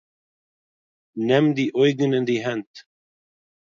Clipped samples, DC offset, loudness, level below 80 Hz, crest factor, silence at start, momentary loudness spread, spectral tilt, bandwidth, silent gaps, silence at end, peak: under 0.1%; under 0.1%; -21 LUFS; -70 dBFS; 18 dB; 1.15 s; 11 LU; -6.5 dB/octave; 7.4 kHz; 2.67-2.74 s; 0.95 s; -6 dBFS